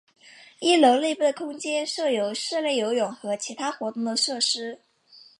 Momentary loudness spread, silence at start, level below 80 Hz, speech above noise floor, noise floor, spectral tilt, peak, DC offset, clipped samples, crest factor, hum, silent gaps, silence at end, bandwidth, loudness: 11 LU; 0.6 s; -84 dBFS; 29 dB; -54 dBFS; -2 dB/octave; -6 dBFS; under 0.1%; under 0.1%; 18 dB; none; none; 0.2 s; 11.5 kHz; -24 LUFS